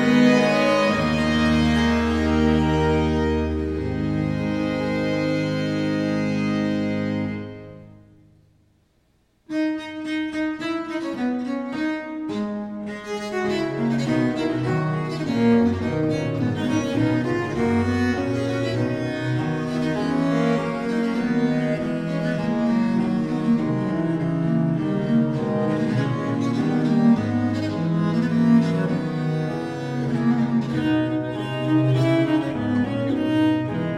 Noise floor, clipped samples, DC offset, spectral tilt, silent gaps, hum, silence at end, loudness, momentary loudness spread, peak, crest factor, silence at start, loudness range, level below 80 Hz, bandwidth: -63 dBFS; under 0.1%; under 0.1%; -7 dB/octave; none; none; 0 s; -22 LUFS; 8 LU; -6 dBFS; 16 dB; 0 s; 6 LU; -42 dBFS; 11 kHz